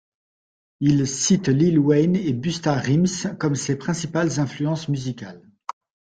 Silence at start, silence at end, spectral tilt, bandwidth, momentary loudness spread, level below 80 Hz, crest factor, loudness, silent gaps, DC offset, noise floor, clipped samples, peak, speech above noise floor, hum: 0.8 s; 0.8 s; -5.5 dB/octave; 9.4 kHz; 18 LU; -56 dBFS; 16 dB; -21 LUFS; none; under 0.1%; under -90 dBFS; under 0.1%; -6 dBFS; over 69 dB; none